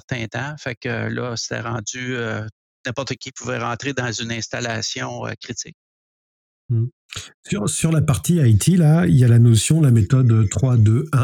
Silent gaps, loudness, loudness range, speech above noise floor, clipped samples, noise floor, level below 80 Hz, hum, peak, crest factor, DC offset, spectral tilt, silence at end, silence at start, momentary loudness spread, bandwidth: 0.77-0.81 s, 2.52-2.84 s, 5.74-6.69 s, 6.93-7.09 s, 7.34-7.43 s; -19 LUFS; 11 LU; over 72 dB; under 0.1%; under -90 dBFS; -46 dBFS; none; -4 dBFS; 14 dB; under 0.1%; -5.5 dB/octave; 0 s; 0.1 s; 15 LU; 14 kHz